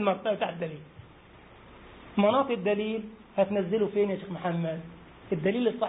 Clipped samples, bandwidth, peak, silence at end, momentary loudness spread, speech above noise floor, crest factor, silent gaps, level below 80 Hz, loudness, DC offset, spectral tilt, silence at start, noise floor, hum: under 0.1%; 4 kHz; -12 dBFS; 0 s; 13 LU; 25 dB; 18 dB; none; -62 dBFS; -29 LUFS; under 0.1%; -10.5 dB/octave; 0 s; -52 dBFS; none